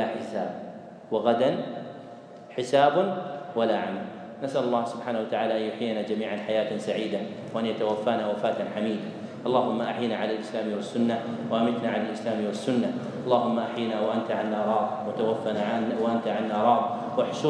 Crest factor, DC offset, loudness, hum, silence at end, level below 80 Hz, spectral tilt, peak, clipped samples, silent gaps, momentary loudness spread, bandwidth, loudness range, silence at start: 20 dB; under 0.1%; -27 LUFS; none; 0 s; -80 dBFS; -6 dB/octave; -8 dBFS; under 0.1%; none; 10 LU; 10 kHz; 2 LU; 0 s